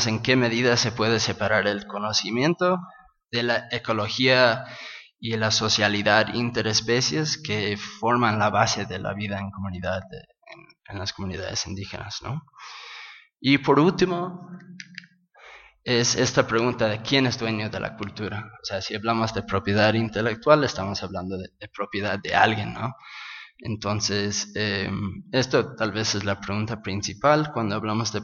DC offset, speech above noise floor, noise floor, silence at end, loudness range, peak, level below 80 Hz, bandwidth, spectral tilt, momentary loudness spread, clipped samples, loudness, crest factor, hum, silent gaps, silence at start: under 0.1%; 27 dB; -52 dBFS; 0 s; 5 LU; 0 dBFS; -56 dBFS; 7.4 kHz; -4 dB/octave; 16 LU; under 0.1%; -24 LUFS; 24 dB; none; none; 0 s